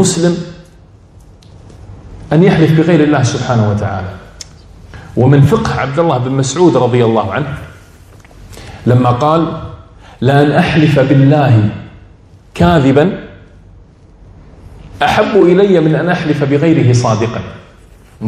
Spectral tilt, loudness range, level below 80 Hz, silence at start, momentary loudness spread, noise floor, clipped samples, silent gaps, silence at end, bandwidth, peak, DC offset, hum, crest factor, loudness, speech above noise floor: -6.5 dB/octave; 4 LU; -38 dBFS; 0 s; 18 LU; -40 dBFS; 0.5%; none; 0 s; 12.5 kHz; 0 dBFS; under 0.1%; none; 12 dB; -11 LUFS; 30 dB